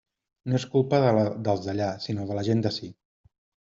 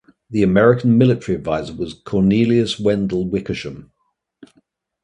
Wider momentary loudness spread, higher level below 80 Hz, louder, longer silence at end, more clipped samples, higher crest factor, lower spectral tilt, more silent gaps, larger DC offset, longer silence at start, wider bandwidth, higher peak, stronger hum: about the same, 11 LU vs 13 LU; second, -64 dBFS vs -46 dBFS; second, -26 LUFS vs -18 LUFS; second, 0.8 s vs 1.2 s; neither; about the same, 20 dB vs 18 dB; about the same, -6.5 dB/octave vs -7.5 dB/octave; neither; neither; first, 0.45 s vs 0.3 s; second, 7.6 kHz vs 10 kHz; second, -8 dBFS vs 0 dBFS; neither